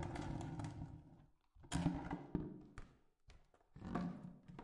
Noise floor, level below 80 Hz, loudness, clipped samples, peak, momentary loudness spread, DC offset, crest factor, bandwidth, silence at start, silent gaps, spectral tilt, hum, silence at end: -67 dBFS; -60 dBFS; -47 LUFS; under 0.1%; -24 dBFS; 19 LU; under 0.1%; 24 dB; 11 kHz; 0 s; none; -6.5 dB/octave; none; 0 s